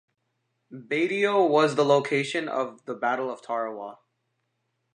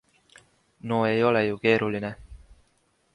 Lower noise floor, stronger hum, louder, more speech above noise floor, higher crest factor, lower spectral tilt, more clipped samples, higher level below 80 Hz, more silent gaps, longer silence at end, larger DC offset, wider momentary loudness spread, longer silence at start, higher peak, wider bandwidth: first, -77 dBFS vs -68 dBFS; neither; about the same, -25 LUFS vs -24 LUFS; first, 52 dB vs 44 dB; about the same, 20 dB vs 20 dB; second, -5 dB/octave vs -7 dB/octave; neither; second, -82 dBFS vs -56 dBFS; neither; first, 1 s vs 0.8 s; neither; second, 12 LU vs 16 LU; second, 0.7 s vs 0.85 s; about the same, -8 dBFS vs -8 dBFS; about the same, 10 kHz vs 11 kHz